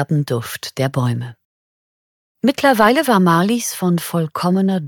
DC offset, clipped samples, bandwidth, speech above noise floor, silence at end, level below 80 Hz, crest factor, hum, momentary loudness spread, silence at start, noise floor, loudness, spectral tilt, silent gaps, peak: under 0.1%; under 0.1%; 19 kHz; over 74 dB; 0 s; -60 dBFS; 16 dB; none; 10 LU; 0 s; under -90 dBFS; -17 LUFS; -5.5 dB/octave; 1.45-2.35 s; 0 dBFS